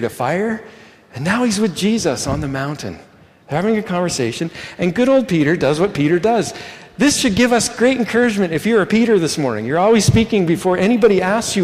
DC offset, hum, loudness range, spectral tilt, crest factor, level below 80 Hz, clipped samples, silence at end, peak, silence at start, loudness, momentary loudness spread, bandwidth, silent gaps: under 0.1%; none; 5 LU; -5 dB/octave; 14 dB; -44 dBFS; under 0.1%; 0 s; -2 dBFS; 0 s; -16 LUFS; 11 LU; 15.5 kHz; none